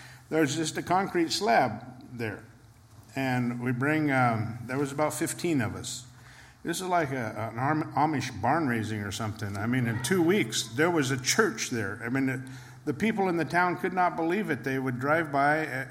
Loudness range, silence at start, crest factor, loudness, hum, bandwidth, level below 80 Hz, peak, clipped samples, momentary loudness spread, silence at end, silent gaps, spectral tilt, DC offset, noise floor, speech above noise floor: 3 LU; 0 s; 20 dB; -28 LUFS; none; 16.5 kHz; -64 dBFS; -8 dBFS; under 0.1%; 11 LU; 0 s; none; -5 dB/octave; under 0.1%; -53 dBFS; 25 dB